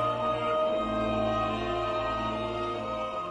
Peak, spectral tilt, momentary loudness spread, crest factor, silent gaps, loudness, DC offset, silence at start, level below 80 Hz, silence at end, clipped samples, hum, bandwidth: -16 dBFS; -6.5 dB/octave; 5 LU; 12 dB; none; -30 LUFS; under 0.1%; 0 s; -48 dBFS; 0 s; under 0.1%; none; 10 kHz